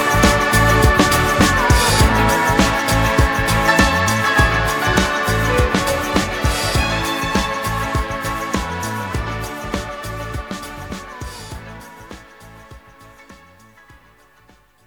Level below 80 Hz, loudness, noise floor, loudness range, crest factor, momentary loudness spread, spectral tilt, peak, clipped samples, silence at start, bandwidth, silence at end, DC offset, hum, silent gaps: -26 dBFS; -16 LUFS; -52 dBFS; 18 LU; 18 dB; 17 LU; -4 dB/octave; 0 dBFS; under 0.1%; 0 s; over 20 kHz; 1.55 s; under 0.1%; none; none